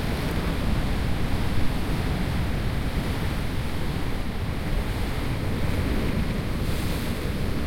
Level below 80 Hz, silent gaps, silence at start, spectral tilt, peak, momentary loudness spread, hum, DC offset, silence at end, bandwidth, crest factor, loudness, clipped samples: -30 dBFS; none; 0 s; -6 dB/octave; -10 dBFS; 3 LU; none; under 0.1%; 0 s; 16.5 kHz; 14 dB; -28 LUFS; under 0.1%